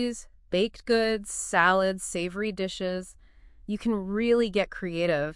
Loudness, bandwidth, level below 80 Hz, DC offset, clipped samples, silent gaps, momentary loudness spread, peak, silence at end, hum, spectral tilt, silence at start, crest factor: -27 LUFS; 12 kHz; -52 dBFS; under 0.1%; under 0.1%; none; 11 LU; -6 dBFS; 0 s; none; -4 dB/octave; 0 s; 20 dB